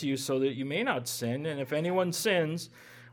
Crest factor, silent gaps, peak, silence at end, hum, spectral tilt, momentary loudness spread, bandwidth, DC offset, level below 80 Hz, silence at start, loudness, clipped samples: 18 dB; none; -14 dBFS; 0 s; none; -4.5 dB/octave; 6 LU; 19 kHz; under 0.1%; -76 dBFS; 0 s; -30 LUFS; under 0.1%